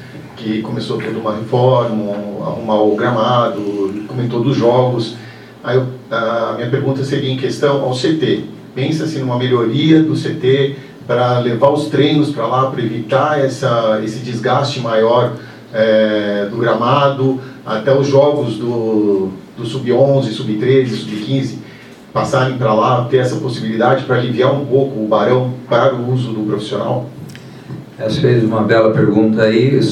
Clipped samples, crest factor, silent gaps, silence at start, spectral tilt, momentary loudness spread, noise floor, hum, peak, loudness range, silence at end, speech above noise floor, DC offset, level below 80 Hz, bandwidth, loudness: under 0.1%; 14 dB; none; 0 s; -7 dB/octave; 10 LU; -36 dBFS; none; 0 dBFS; 3 LU; 0 s; 22 dB; under 0.1%; -56 dBFS; 11 kHz; -15 LUFS